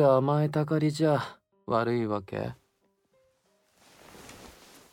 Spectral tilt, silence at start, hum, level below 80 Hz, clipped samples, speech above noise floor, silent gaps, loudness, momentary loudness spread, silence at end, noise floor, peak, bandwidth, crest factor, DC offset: -7.5 dB/octave; 0 s; none; -66 dBFS; under 0.1%; 46 dB; none; -28 LUFS; 23 LU; 0.4 s; -72 dBFS; -12 dBFS; 15.5 kHz; 18 dB; under 0.1%